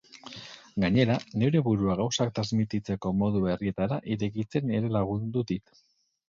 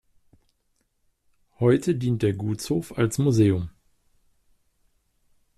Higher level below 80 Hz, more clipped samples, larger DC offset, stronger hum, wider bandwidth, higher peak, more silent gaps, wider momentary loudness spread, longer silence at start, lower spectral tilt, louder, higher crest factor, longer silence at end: about the same, -54 dBFS vs -56 dBFS; neither; neither; neither; second, 7.4 kHz vs 13.5 kHz; about the same, -10 dBFS vs -8 dBFS; neither; about the same, 10 LU vs 8 LU; second, 0.25 s vs 1.6 s; about the same, -6.5 dB/octave vs -7 dB/octave; second, -28 LUFS vs -24 LUFS; about the same, 18 dB vs 18 dB; second, 0.7 s vs 1.9 s